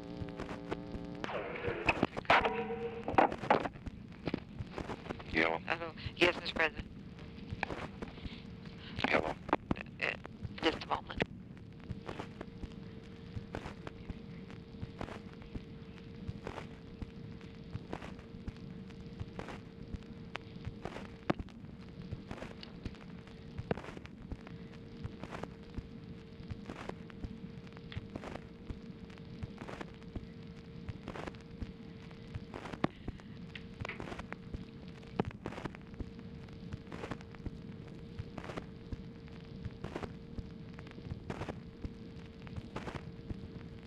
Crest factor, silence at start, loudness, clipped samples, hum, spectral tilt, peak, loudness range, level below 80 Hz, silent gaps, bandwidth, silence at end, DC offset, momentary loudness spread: 28 dB; 0 s; -41 LUFS; under 0.1%; none; -6 dB/octave; -14 dBFS; 13 LU; -54 dBFS; none; 13.5 kHz; 0 s; under 0.1%; 17 LU